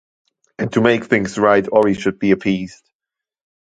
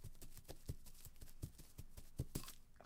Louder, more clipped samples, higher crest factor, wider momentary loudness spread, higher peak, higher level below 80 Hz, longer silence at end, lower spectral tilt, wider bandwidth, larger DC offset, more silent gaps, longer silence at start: first, -17 LUFS vs -55 LUFS; neither; second, 18 dB vs 24 dB; about the same, 9 LU vs 11 LU; first, 0 dBFS vs -28 dBFS; first, -52 dBFS vs -58 dBFS; first, 0.95 s vs 0 s; first, -6.5 dB/octave vs -5 dB/octave; second, 9.2 kHz vs 17 kHz; neither; neither; first, 0.6 s vs 0 s